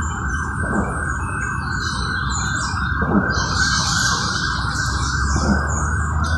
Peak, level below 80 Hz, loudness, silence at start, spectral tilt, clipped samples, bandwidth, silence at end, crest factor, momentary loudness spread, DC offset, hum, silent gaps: -4 dBFS; -26 dBFS; -20 LUFS; 0 s; -3.5 dB/octave; under 0.1%; 12.5 kHz; 0 s; 16 dB; 6 LU; under 0.1%; none; none